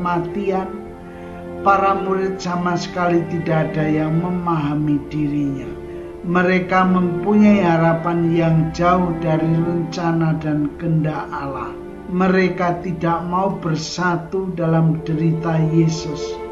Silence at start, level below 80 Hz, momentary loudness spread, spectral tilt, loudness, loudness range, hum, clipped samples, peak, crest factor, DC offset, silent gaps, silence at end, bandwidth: 0 s; -42 dBFS; 11 LU; -7.5 dB/octave; -19 LUFS; 4 LU; none; under 0.1%; -2 dBFS; 16 dB; under 0.1%; none; 0 s; 7.6 kHz